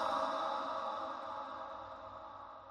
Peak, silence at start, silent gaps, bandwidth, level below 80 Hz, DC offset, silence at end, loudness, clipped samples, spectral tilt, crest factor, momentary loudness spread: -24 dBFS; 0 s; none; 12.5 kHz; -72 dBFS; under 0.1%; 0 s; -41 LUFS; under 0.1%; -3.5 dB/octave; 18 dB; 14 LU